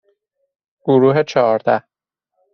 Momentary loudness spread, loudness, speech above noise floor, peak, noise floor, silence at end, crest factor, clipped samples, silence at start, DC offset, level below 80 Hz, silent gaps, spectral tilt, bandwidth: 7 LU; -15 LUFS; 62 dB; -2 dBFS; -76 dBFS; 0.75 s; 16 dB; under 0.1%; 0.85 s; under 0.1%; -64 dBFS; none; -6 dB/octave; 6.8 kHz